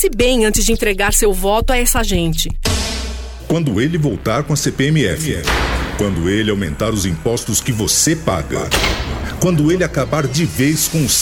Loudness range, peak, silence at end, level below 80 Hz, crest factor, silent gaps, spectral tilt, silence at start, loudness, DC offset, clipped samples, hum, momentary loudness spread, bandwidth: 2 LU; 0 dBFS; 0 s; -24 dBFS; 14 dB; none; -4 dB/octave; 0 s; -16 LUFS; under 0.1%; under 0.1%; none; 6 LU; 19.5 kHz